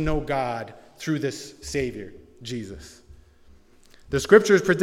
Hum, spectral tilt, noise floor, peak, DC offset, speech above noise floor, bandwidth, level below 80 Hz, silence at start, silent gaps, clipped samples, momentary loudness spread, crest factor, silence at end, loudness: none; -5 dB/octave; -53 dBFS; 0 dBFS; under 0.1%; 30 dB; 15 kHz; -42 dBFS; 0 s; none; under 0.1%; 23 LU; 24 dB; 0 s; -23 LUFS